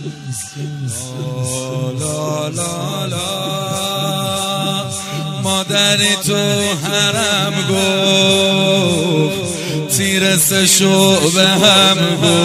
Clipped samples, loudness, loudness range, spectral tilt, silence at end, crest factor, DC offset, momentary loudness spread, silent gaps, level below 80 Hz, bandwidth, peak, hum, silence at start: under 0.1%; -14 LUFS; 9 LU; -3.5 dB/octave; 0 s; 16 dB; under 0.1%; 12 LU; none; -52 dBFS; 16 kHz; 0 dBFS; none; 0 s